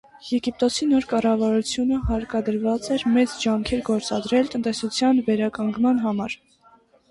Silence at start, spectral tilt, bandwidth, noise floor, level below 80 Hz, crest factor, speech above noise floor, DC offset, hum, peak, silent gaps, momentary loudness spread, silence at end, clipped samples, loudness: 0.15 s; -5 dB/octave; 11.5 kHz; -56 dBFS; -42 dBFS; 14 dB; 34 dB; under 0.1%; none; -8 dBFS; none; 6 LU; 0.75 s; under 0.1%; -22 LUFS